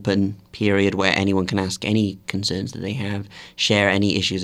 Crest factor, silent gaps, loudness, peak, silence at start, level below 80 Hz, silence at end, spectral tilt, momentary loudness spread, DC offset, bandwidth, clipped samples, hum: 22 dB; none; -21 LUFS; 0 dBFS; 0 s; -52 dBFS; 0 s; -5 dB/octave; 10 LU; under 0.1%; 13 kHz; under 0.1%; none